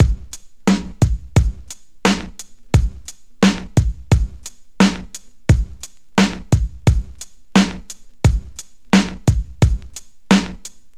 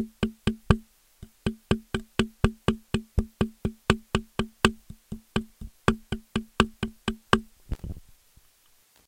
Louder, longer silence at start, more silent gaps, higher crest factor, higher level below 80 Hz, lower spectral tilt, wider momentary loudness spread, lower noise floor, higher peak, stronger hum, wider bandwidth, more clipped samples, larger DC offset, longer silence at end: first, -19 LUFS vs -29 LUFS; about the same, 0 s vs 0 s; neither; second, 18 dB vs 28 dB; first, -24 dBFS vs -38 dBFS; about the same, -5.5 dB/octave vs -5.5 dB/octave; first, 20 LU vs 13 LU; second, -39 dBFS vs -62 dBFS; about the same, 0 dBFS vs -2 dBFS; neither; second, 14 kHz vs 16.5 kHz; neither; first, 1% vs under 0.1%; second, 0.3 s vs 1.05 s